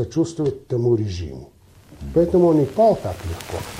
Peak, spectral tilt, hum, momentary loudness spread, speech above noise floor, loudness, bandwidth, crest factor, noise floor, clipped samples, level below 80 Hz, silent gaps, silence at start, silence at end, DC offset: -6 dBFS; -7.5 dB/octave; none; 15 LU; 22 dB; -20 LUFS; 16 kHz; 16 dB; -42 dBFS; under 0.1%; -42 dBFS; none; 0 s; 0 s; under 0.1%